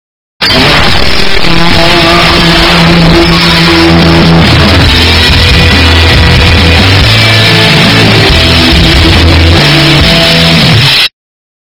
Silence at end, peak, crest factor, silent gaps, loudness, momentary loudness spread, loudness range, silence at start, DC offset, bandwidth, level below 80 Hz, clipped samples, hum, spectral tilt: 0.45 s; 0 dBFS; 4 dB; none; -3 LUFS; 2 LU; 1 LU; 0.4 s; under 0.1%; over 20 kHz; -14 dBFS; 20%; none; -5 dB/octave